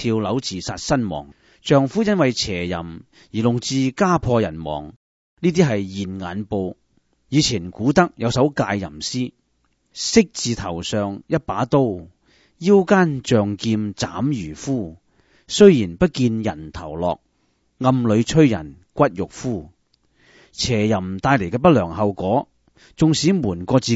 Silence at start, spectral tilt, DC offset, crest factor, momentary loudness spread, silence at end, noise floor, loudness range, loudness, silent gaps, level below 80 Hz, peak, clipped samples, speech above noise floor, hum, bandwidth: 0 s; -5.5 dB/octave; under 0.1%; 20 dB; 12 LU; 0 s; -66 dBFS; 3 LU; -20 LUFS; 4.96-5.37 s; -46 dBFS; 0 dBFS; under 0.1%; 47 dB; none; 8 kHz